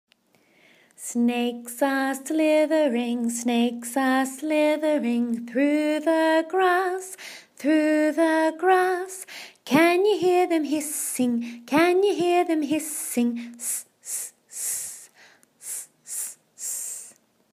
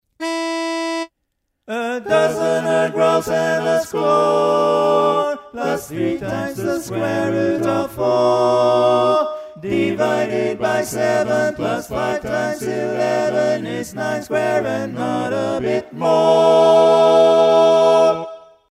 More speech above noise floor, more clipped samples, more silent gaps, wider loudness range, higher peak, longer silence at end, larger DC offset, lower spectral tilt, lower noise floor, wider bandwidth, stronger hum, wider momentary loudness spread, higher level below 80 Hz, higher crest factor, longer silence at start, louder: second, 40 dB vs 57 dB; neither; neither; about the same, 8 LU vs 7 LU; second, -6 dBFS vs -2 dBFS; first, 0.45 s vs 0.3 s; neither; second, -3 dB/octave vs -5 dB/octave; second, -62 dBFS vs -73 dBFS; about the same, 15.5 kHz vs 15 kHz; neither; about the same, 13 LU vs 11 LU; second, -76 dBFS vs -54 dBFS; about the same, 18 dB vs 16 dB; first, 1 s vs 0.2 s; second, -24 LUFS vs -17 LUFS